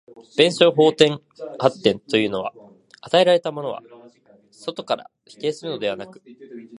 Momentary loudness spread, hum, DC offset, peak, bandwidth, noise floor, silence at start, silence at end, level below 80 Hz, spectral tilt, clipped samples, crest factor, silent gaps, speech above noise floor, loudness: 18 LU; none; under 0.1%; 0 dBFS; 11.5 kHz; -53 dBFS; 0.2 s; 0 s; -66 dBFS; -5 dB/octave; under 0.1%; 22 dB; none; 33 dB; -20 LUFS